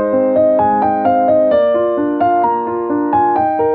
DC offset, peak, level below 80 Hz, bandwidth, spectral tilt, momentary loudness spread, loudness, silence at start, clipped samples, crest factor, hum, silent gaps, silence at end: under 0.1%; -2 dBFS; -50 dBFS; 4.5 kHz; -10.5 dB/octave; 4 LU; -14 LUFS; 0 s; under 0.1%; 12 dB; none; none; 0 s